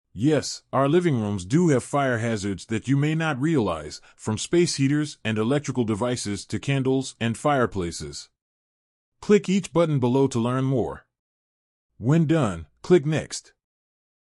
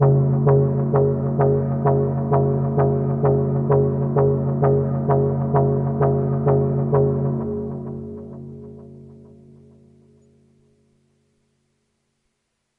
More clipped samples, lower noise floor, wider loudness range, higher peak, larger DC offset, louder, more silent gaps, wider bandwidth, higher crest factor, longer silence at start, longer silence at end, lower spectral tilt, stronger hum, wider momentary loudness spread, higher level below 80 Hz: neither; first, under -90 dBFS vs -74 dBFS; second, 2 LU vs 12 LU; about the same, -6 dBFS vs -6 dBFS; neither; second, -24 LUFS vs -19 LUFS; first, 8.42-9.12 s, 11.19-11.89 s vs none; first, 12 kHz vs 2.4 kHz; about the same, 18 dB vs 16 dB; first, 0.15 s vs 0 s; second, 0.95 s vs 3.65 s; second, -6 dB/octave vs -13.5 dB/octave; neither; second, 11 LU vs 15 LU; second, -56 dBFS vs -50 dBFS